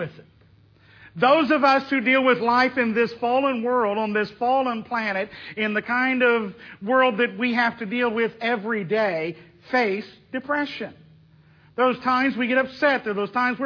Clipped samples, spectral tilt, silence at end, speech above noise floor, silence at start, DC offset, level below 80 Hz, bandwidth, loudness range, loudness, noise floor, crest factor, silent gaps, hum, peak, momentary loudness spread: under 0.1%; -6.5 dB/octave; 0 s; 33 dB; 0 s; under 0.1%; -66 dBFS; 5.4 kHz; 5 LU; -22 LUFS; -55 dBFS; 16 dB; none; none; -6 dBFS; 12 LU